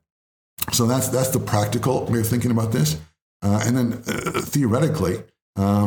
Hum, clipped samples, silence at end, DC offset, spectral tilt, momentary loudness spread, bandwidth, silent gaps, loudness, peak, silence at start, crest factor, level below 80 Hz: none; under 0.1%; 0 s; under 0.1%; -5.5 dB/octave; 6 LU; over 20 kHz; 3.22-3.40 s, 5.42-5.53 s; -22 LUFS; -4 dBFS; 0.6 s; 18 dB; -50 dBFS